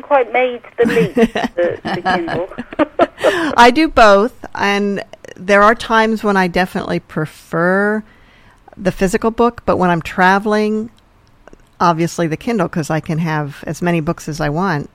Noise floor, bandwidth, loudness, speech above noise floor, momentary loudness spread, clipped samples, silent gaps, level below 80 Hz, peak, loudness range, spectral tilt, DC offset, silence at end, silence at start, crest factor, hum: -49 dBFS; 16 kHz; -15 LUFS; 34 dB; 12 LU; under 0.1%; none; -40 dBFS; 0 dBFS; 6 LU; -5.5 dB/octave; under 0.1%; 0.1 s; 0.05 s; 16 dB; none